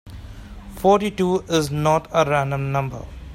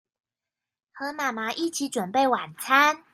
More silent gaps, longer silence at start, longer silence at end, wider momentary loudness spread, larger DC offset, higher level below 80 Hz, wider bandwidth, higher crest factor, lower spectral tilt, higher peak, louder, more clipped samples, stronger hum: neither; second, 0.05 s vs 0.95 s; second, 0 s vs 0.15 s; first, 21 LU vs 9 LU; neither; first, -42 dBFS vs -78 dBFS; about the same, 16.5 kHz vs 15.5 kHz; about the same, 18 dB vs 22 dB; first, -6 dB/octave vs -2.5 dB/octave; about the same, -4 dBFS vs -4 dBFS; first, -20 LUFS vs -24 LUFS; neither; neither